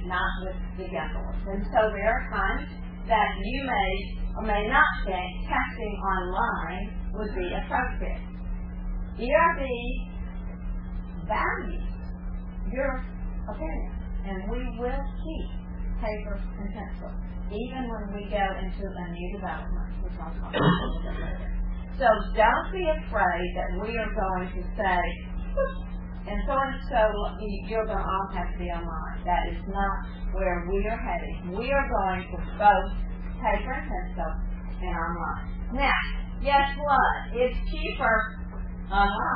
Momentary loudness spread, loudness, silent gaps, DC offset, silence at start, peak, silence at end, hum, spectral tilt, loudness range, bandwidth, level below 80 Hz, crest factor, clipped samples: 13 LU; -29 LUFS; none; under 0.1%; 0 s; -6 dBFS; 0 s; none; -9.5 dB/octave; 7 LU; 5 kHz; -32 dBFS; 20 dB; under 0.1%